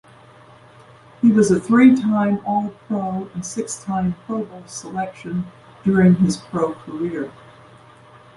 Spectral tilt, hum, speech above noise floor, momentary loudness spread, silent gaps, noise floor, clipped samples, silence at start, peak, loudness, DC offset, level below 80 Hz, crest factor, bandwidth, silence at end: -7 dB/octave; none; 28 dB; 15 LU; none; -46 dBFS; under 0.1%; 1.2 s; -2 dBFS; -19 LUFS; under 0.1%; -52 dBFS; 18 dB; 11.5 kHz; 1.05 s